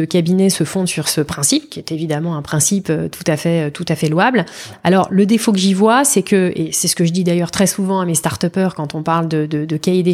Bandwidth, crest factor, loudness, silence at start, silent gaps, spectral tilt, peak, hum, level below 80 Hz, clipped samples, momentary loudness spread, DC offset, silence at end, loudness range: 16 kHz; 14 dB; -16 LUFS; 0 s; none; -4.5 dB/octave; -2 dBFS; none; -52 dBFS; under 0.1%; 7 LU; under 0.1%; 0 s; 3 LU